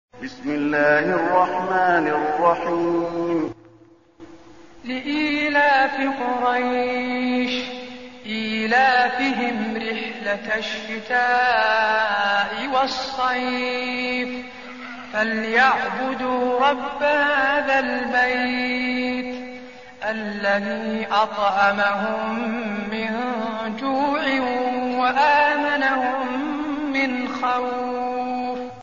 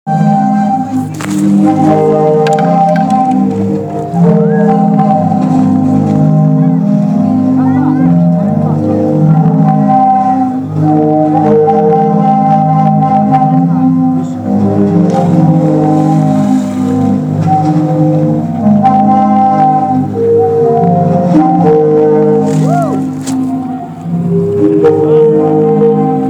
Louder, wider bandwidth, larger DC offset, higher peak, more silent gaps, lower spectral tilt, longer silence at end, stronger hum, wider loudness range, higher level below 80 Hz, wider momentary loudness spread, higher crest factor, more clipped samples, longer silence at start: second, -21 LUFS vs -9 LUFS; second, 7.2 kHz vs 10 kHz; first, 0.3% vs under 0.1%; second, -4 dBFS vs 0 dBFS; neither; second, -1.5 dB/octave vs -9 dB/octave; about the same, 0 s vs 0 s; neither; about the same, 3 LU vs 2 LU; second, -58 dBFS vs -50 dBFS; first, 10 LU vs 5 LU; first, 16 dB vs 8 dB; second, under 0.1% vs 0.4%; about the same, 0.15 s vs 0.05 s